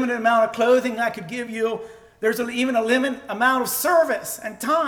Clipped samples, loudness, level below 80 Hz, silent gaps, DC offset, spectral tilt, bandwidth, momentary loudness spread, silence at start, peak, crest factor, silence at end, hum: under 0.1%; -21 LUFS; -64 dBFS; none; under 0.1%; -3 dB/octave; over 20 kHz; 10 LU; 0 s; -6 dBFS; 14 dB; 0 s; none